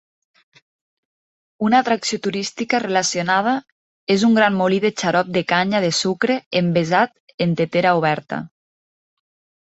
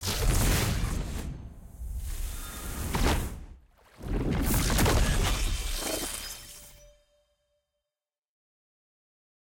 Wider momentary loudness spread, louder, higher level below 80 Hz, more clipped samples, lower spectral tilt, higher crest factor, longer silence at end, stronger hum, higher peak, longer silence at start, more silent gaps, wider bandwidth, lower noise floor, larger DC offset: second, 8 LU vs 19 LU; first, -19 LUFS vs -30 LUFS; second, -62 dBFS vs -34 dBFS; neither; about the same, -4.5 dB/octave vs -4 dB/octave; about the same, 18 dB vs 16 dB; second, 1.15 s vs 2.65 s; neither; first, -2 dBFS vs -14 dBFS; first, 1.6 s vs 0 s; first, 3.72-4.07 s, 6.46-6.51 s, 7.20-7.27 s, 7.34-7.38 s vs none; second, 8.2 kHz vs 17 kHz; about the same, under -90 dBFS vs under -90 dBFS; neither